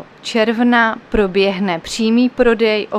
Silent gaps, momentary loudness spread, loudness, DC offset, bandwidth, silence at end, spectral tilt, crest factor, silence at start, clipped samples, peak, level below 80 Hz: none; 6 LU; -15 LUFS; under 0.1%; 11.5 kHz; 0 s; -5 dB/octave; 14 dB; 0 s; under 0.1%; -2 dBFS; -36 dBFS